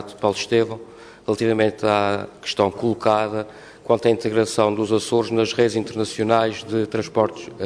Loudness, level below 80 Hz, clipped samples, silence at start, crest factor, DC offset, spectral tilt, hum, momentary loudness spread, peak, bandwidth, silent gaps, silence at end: -21 LUFS; -58 dBFS; under 0.1%; 0 s; 18 dB; under 0.1%; -5 dB/octave; none; 8 LU; -4 dBFS; 11 kHz; none; 0 s